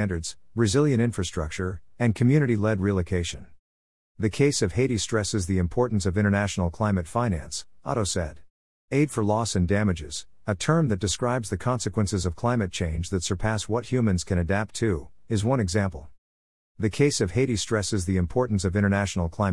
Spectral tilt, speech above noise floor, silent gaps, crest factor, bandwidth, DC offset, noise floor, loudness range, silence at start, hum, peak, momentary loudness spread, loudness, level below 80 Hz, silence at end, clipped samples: -5.5 dB/octave; over 65 dB; 3.59-4.15 s, 8.50-8.88 s, 16.18-16.75 s; 16 dB; 12 kHz; 0.4%; under -90 dBFS; 2 LU; 0 s; none; -8 dBFS; 8 LU; -25 LUFS; -46 dBFS; 0 s; under 0.1%